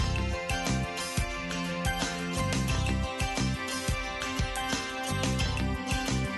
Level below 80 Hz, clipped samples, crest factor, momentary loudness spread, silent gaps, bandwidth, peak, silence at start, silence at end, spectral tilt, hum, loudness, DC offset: -38 dBFS; under 0.1%; 16 dB; 3 LU; none; 12.5 kHz; -14 dBFS; 0 s; 0 s; -4 dB/octave; none; -31 LUFS; under 0.1%